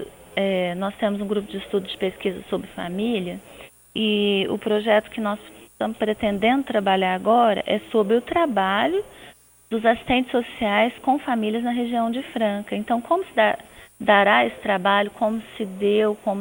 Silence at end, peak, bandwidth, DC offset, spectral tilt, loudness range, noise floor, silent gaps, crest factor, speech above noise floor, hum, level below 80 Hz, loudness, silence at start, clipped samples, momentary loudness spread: 0 s; -4 dBFS; over 20 kHz; under 0.1%; -5.5 dB/octave; 5 LU; -48 dBFS; none; 20 dB; 27 dB; none; -54 dBFS; -22 LUFS; 0 s; under 0.1%; 10 LU